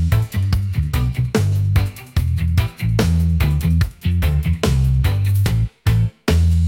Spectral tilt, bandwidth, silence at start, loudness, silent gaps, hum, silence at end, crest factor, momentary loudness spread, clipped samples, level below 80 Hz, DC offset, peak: -6.5 dB/octave; 17 kHz; 0 s; -19 LUFS; none; none; 0 s; 12 dB; 3 LU; under 0.1%; -24 dBFS; under 0.1%; -4 dBFS